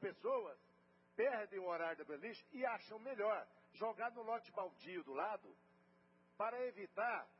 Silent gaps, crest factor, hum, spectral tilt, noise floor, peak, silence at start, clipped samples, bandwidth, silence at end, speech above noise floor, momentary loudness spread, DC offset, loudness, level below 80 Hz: none; 18 dB; none; -2.5 dB/octave; -73 dBFS; -28 dBFS; 0 s; under 0.1%; 5.6 kHz; 0.15 s; 29 dB; 10 LU; under 0.1%; -45 LUFS; under -90 dBFS